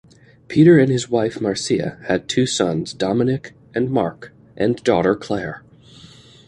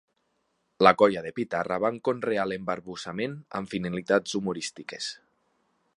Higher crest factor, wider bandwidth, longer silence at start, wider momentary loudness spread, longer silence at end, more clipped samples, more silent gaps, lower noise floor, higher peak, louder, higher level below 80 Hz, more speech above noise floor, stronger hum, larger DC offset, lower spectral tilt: second, 18 dB vs 26 dB; about the same, 11 kHz vs 11.5 kHz; second, 0.5 s vs 0.8 s; about the same, 12 LU vs 14 LU; about the same, 0.9 s vs 0.85 s; neither; neither; second, -45 dBFS vs -74 dBFS; about the same, -2 dBFS vs -2 dBFS; first, -19 LUFS vs -27 LUFS; first, -52 dBFS vs -64 dBFS; second, 27 dB vs 47 dB; neither; neither; about the same, -5.5 dB/octave vs -5 dB/octave